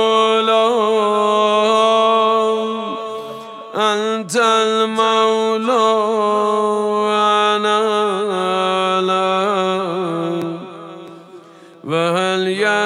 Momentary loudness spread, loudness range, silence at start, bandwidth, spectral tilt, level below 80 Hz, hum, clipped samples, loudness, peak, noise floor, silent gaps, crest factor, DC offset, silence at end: 12 LU; 5 LU; 0 s; 13.5 kHz; -4 dB/octave; -80 dBFS; none; under 0.1%; -16 LUFS; -2 dBFS; -41 dBFS; none; 14 dB; under 0.1%; 0 s